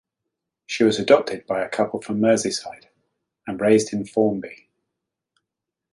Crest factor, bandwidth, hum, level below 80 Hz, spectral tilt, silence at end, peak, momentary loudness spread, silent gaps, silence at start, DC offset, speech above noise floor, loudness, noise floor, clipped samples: 20 dB; 11.5 kHz; none; -62 dBFS; -4.5 dB/octave; 1.4 s; -2 dBFS; 14 LU; none; 0.7 s; under 0.1%; 64 dB; -21 LUFS; -84 dBFS; under 0.1%